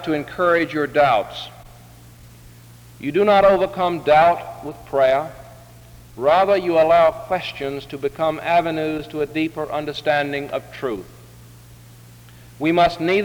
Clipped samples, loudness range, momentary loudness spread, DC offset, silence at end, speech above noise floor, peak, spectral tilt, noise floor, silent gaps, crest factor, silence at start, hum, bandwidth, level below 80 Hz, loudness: under 0.1%; 7 LU; 14 LU; under 0.1%; 0 s; 25 dB; -4 dBFS; -6 dB/octave; -44 dBFS; none; 16 dB; 0 s; none; over 20 kHz; -50 dBFS; -19 LUFS